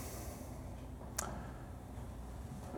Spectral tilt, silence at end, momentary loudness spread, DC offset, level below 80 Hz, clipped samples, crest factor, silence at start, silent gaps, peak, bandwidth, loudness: -4.5 dB/octave; 0 s; 7 LU; under 0.1%; -52 dBFS; under 0.1%; 28 dB; 0 s; none; -18 dBFS; over 20 kHz; -47 LUFS